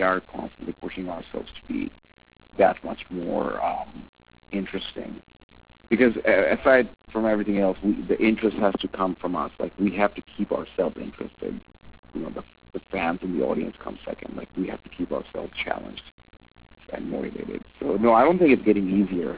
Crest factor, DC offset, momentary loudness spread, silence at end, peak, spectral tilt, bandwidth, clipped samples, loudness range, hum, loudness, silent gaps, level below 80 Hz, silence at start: 20 dB; 0.1%; 17 LU; 0 s; -6 dBFS; -10 dB/octave; 4 kHz; under 0.1%; 9 LU; none; -25 LUFS; 4.09-4.13 s, 5.43-5.49 s, 11.99-12.03 s, 16.12-16.18 s; -52 dBFS; 0 s